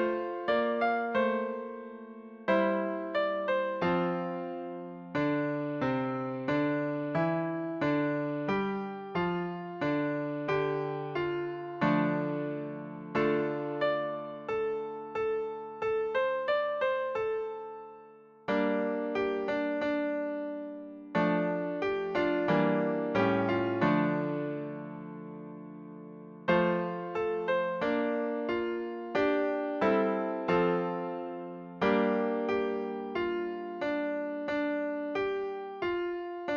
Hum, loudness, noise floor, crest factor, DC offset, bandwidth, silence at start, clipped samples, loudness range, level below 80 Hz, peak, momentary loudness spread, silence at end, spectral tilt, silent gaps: none; -31 LUFS; -54 dBFS; 18 dB; under 0.1%; 7 kHz; 0 s; under 0.1%; 3 LU; -66 dBFS; -14 dBFS; 12 LU; 0 s; -8 dB/octave; none